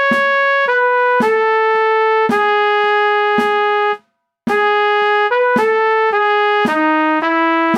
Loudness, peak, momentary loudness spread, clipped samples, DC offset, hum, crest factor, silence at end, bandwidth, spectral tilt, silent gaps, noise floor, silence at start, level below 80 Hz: -14 LUFS; -2 dBFS; 1 LU; under 0.1%; under 0.1%; none; 12 dB; 0 s; 11.5 kHz; -4.5 dB/octave; none; -55 dBFS; 0 s; -68 dBFS